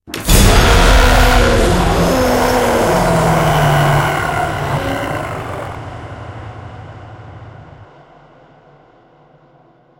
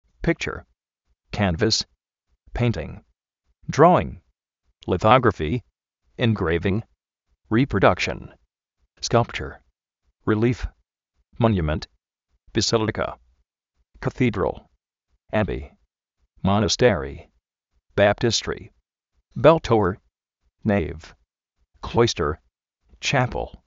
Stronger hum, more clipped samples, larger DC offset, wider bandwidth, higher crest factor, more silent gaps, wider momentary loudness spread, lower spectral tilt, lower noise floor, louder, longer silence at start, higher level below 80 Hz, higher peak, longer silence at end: neither; neither; neither; first, 16.5 kHz vs 7.6 kHz; second, 14 dB vs 22 dB; neither; first, 22 LU vs 18 LU; about the same, -4.5 dB/octave vs -5 dB/octave; second, -49 dBFS vs -73 dBFS; first, -13 LUFS vs -22 LUFS; second, 0.05 s vs 0.2 s; first, -20 dBFS vs -42 dBFS; about the same, 0 dBFS vs -2 dBFS; first, 2.15 s vs 0.15 s